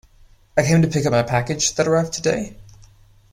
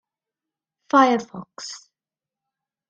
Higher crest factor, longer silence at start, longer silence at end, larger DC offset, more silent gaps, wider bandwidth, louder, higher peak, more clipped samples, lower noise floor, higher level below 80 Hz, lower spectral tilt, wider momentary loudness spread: about the same, 18 dB vs 22 dB; second, 0.55 s vs 0.95 s; second, 0.6 s vs 1.1 s; neither; neither; first, 15.5 kHz vs 8.8 kHz; about the same, -19 LUFS vs -19 LUFS; about the same, -4 dBFS vs -4 dBFS; neither; second, -51 dBFS vs under -90 dBFS; first, -46 dBFS vs -72 dBFS; about the same, -5 dB/octave vs -4 dB/octave; second, 7 LU vs 21 LU